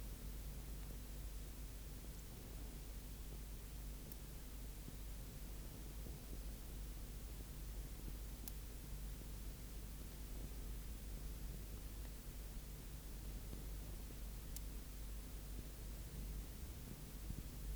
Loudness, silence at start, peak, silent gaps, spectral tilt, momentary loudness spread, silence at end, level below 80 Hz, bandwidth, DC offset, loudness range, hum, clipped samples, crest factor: -53 LUFS; 0 s; -26 dBFS; none; -4.5 dB/octave; 2 LU; 0 s; -50 dBFS; over 20 kHz; under 0.1%; 1 LU; none; under 0.1%; 24 dB